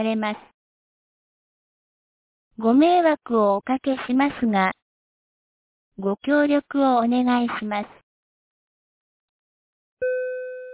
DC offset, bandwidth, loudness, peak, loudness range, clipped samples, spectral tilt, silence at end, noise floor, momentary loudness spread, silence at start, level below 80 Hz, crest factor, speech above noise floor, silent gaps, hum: under 0.1%; 4 kHz; -22 LUFS; -6 dBFS; 5 LU; under 0.1%; -9.5 dB/octave; 0 s; under -90 dBFS; 12 LU; 0 s; -64 dBFS; 18 dB; over 69 dB; 0.54-2.51 s, 4.82-5.92 s, 8.03-9.97 s; none